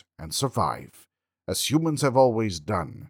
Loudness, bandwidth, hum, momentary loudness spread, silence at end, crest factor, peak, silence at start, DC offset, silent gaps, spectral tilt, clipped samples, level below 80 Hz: -25 LUFS; 19.5 kHz; none; 11 LU; 0 s; 18 dB; -6 dBFS; 0.2 s; under 0.1%; none; -5 dB/octave; under 0.1%; -54 dBFS